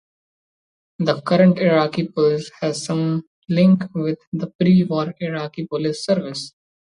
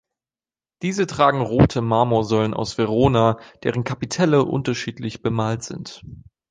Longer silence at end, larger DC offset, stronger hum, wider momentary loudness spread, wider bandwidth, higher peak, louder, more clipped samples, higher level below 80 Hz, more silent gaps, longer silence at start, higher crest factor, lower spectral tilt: about the same, 0.4 s vs 0.3 s; neither; neither; about the same, 12 LU vs 11 LU; about the same, 10.5 kHz vs 9.8 kHz; about the same, -4 dBFS vs -2 dBFS; about the same, -20 LUFS vs -20 LUFS; neither; second, -62 dBFS vs -42 dBFS; first, 3.27-3.42 s, 4.27-4.32 s, 4.55-4.59 s vs none; first, 1 s vs 0.8 s; about the same, 16 dB vs 18 dB; about the same, -7 dB/octave vs -6.5 dB/octave